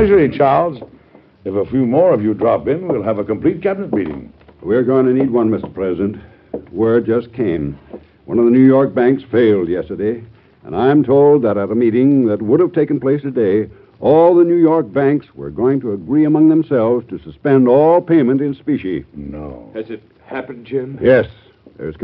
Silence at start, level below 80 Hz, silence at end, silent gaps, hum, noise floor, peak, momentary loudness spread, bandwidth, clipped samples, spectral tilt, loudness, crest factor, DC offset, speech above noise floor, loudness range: 0 s; -46 dBFS; 0 s; none; none; -46 dBFS; 0 dBFS; 18 LU; 5 kHz; under 0.1%; -7.5 dB/octave; -14 LUFS; 14 dB; under 0.1%; 32 dB; 4 LU